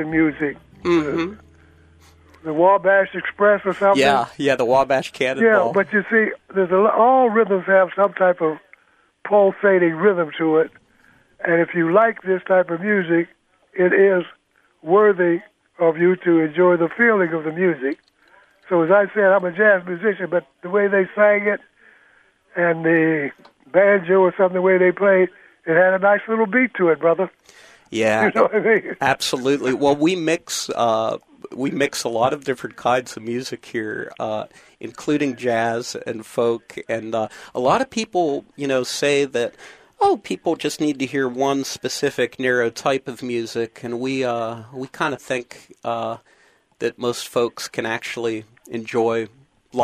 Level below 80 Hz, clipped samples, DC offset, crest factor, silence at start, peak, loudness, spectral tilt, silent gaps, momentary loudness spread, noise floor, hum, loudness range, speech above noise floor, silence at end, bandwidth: -62 dBFS; under 0.1%; under 0.1%; 18 dB; 0 s; -2 dBFS; -19 LUFS; -5 dB/octave; none; 12 LU; -59 dBFS; none; 8 LU; 41 dB; 0 s; 15 kHz